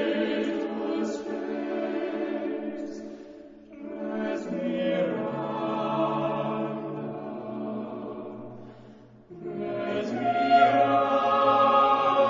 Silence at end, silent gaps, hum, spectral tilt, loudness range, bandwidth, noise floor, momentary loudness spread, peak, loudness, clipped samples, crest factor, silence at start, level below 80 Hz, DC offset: 0 s; none; none; -6.5 dB/octave; 11 LU; 7.6 kHz; -50 dBFS; 20 LU; -8 dBFS; -27 LUFS; under 0.1%; 18 dB; 0 s; -68 dBFS; under 0.1%